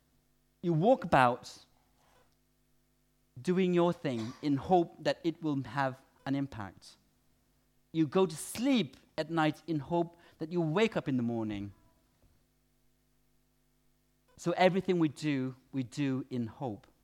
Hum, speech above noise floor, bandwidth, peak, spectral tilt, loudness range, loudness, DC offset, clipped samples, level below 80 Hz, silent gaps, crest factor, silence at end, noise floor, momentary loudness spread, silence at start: 50 Hz at -65 dBFS; 41 dB; 16 kHz; -10 dBFS; -6.5 dB/octave; 5 LU; -32 LUFS; under 0.1%; under 0.1%; -66 dBFS; none; 24 dB; 0.25 s; -73 dBFS; 12 LU; 0.65 s